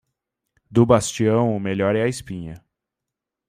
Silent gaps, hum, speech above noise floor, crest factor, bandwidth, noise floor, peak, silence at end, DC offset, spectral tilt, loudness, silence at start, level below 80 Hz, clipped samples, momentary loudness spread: none; none; 65 dB; 20 dB; 15 kHz; -85 dBFS; -2 dBFS; 0.9 s; under 0.1%; -6 dB/octave; -20 LUFS; 0.7 s; -52 dBFS; under 0.1%; 17 LU